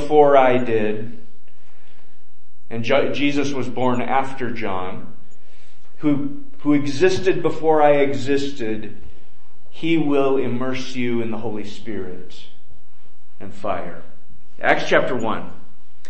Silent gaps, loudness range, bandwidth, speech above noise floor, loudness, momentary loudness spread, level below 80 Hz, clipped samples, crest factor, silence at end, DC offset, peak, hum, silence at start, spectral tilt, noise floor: none; 9 LU; 8.6 kHz; 40 dB; -21 LUFS; 16 LU; -58 dBFS; under 0.1%; 20 dB; 0.55 s; 10%; 0 dBFS; none; 0 s; -6 dB/octave; -60 dBFS